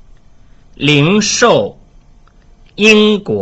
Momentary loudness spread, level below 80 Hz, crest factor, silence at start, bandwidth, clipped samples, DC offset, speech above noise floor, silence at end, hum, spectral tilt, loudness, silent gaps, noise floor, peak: 8 LU; -42 dBFS; 14 dB; 0.8 s; 8.2 kHz; under 0.1%; under 0.1%; 34 dB; 0 s; none; -4 dB/octave; -10 LUFS; none; -44 dBFS; 0 dBFS